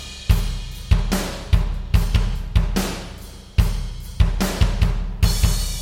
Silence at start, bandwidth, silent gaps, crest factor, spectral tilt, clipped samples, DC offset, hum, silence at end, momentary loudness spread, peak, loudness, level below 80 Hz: 0 s; 16.5 kHz; none; 18 dB; -5 dB/octave; under 0.1%; 0.2%; none; 0 s; 10 LU; -2 dBFS; -22 LUFS; -22 dBFS